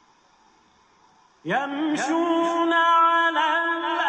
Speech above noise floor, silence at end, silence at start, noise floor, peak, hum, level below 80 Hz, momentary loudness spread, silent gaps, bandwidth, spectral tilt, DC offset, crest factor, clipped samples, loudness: 38 dB; 0 s; 1.45 s; -59 dBFS; -10 dBFS; none; -76 dBFS; 9 LU; none; 9.6 kHz; -3.5 dB/octave; under 0.1%; 14 dB; under 0.1%; -21 LUFS